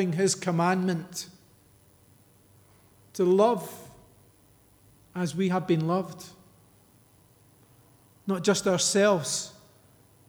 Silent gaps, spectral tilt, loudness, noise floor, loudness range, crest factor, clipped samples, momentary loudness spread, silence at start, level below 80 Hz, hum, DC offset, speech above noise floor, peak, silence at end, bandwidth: none; -4.5 dB/octave; -26 LUFS; -60 dBFS; 4 LU; 20 dB; under 0.1%; 20 LU; 0 s; -70 dBFS; none; under 0.1%; 34 dB; -10 dBFS; 0.75 s; over 20 kHz